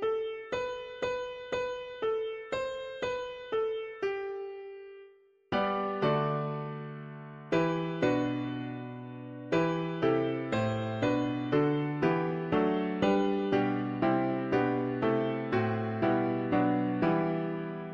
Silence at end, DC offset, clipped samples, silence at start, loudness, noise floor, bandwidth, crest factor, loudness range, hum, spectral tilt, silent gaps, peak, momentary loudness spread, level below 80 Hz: 0 s; under 0.1%; under 0.1%; 0 s; -31 LUFS; -58 dBFS; 7.4 kHz; 16 dB; 6 LU; none; -7.5 dB/octave; none; -16 dBFS; 11 LU; -62 dBFS